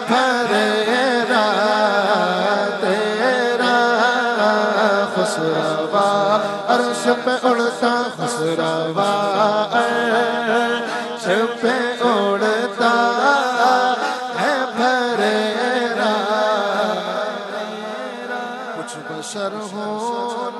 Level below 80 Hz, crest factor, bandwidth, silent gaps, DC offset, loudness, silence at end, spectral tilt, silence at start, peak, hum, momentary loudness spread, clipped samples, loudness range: -72 dBFS; 16 dB; 12 kHz; none; under 0.1%; -18 LUFS; 0 s; -4 dB/octave; 0 s; -2 dBFS; none; 10 LU; under 0.1%; 4 LU